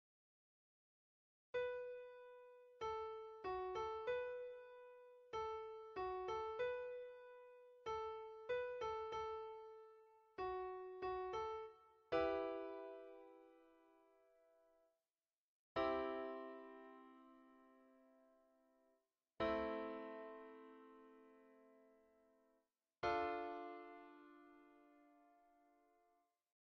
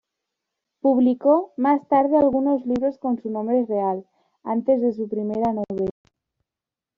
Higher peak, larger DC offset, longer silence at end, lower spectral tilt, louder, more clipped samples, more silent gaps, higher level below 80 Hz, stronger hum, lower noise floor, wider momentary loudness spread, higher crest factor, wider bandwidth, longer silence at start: second, -28 dBFS vs -6 dBFS; neither; first, 1.4 s vs 1.05 s; second, -3 dB/octave vs -8 dB/octave; second, -47 LUFS vs -22 LUFS; neither; first, 15.40-15.75 s vs none; second, -74 dBFS vs -60 dBFS; neither; about the same, under -90 dBFS vs -89 dBFS; first, 21 LU vs 9 LU; first, 22 dB vs 16 dB; first, 7 kHz vs 5.4 kHz; first, 1.55 s vs 0.85 s